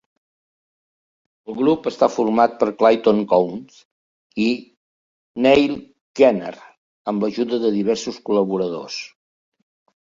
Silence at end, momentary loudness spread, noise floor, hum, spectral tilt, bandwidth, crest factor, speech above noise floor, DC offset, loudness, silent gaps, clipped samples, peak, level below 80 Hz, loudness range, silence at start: 1 s; 17 LU; under -90 dBFS; none; -5.5 dB/octave; 7.6 kHz; 18 dB; over 72 dB; under 0.1%; -19 LUFS; 3.85-4.30 s, 4.77-5.34 s, 6.01-6.15 s, 6.77-7.05 s; under 0.1%; -2 dBFS; -60 dBFS; 4 LU; 1.5 s